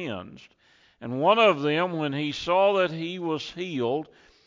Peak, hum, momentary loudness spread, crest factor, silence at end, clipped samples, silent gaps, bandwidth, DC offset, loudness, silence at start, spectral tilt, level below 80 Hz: -8 dBFS; none; 16 LU; 18 dB; 0.45 s; under 0.1%; none; 7.6 kHz; under 0.1%; -25 LUFS; 0 s; -6 dB/octave; -64 dBFS